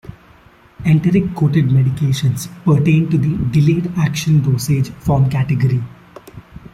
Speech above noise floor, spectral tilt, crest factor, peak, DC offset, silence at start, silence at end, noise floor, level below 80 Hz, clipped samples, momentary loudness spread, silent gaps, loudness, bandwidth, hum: 32 dB; -7 dB/octave; 12 dB; -2 dBFS; under 0.1%; 0.05 s; 0.15 s; -46 dBFS; -42 dBFS; under 0.1%; 5 LU; none; -16 LUFS; 14.5 kHz; none